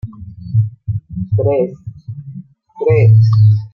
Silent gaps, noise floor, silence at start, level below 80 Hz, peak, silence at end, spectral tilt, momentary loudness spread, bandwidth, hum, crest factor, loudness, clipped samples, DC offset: none; -34 dBFS; 0.05 s; -44 dBFS; -2 dBFS; 0.05 s; -10.5 dB/octave; 23 LU; 5.6 kHz; none; 12 dB; -14 LUFS; under 0.1%; under 0.1%